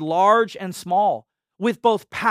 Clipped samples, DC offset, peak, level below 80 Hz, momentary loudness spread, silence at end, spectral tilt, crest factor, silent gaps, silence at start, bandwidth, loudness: under 0.1%; under 0.1%; -4 dBFS; -66 dBFS; 10 LU; 0 s; -5 dB/octave; 16 dB; none; 0 s; 15.5 kHz; -20 LUFS